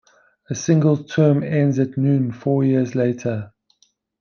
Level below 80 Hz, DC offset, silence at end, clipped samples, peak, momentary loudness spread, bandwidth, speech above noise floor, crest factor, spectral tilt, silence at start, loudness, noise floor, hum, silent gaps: -62 dBFS; under 0.1%; 0.7 s; under 0.1%; -4 dBFS; 9 LU; 7 kHz; 43 dB; 16 dB; -7.5 dB/octave; 0.5 s; -19 LUFS; -61 dBFS; none; none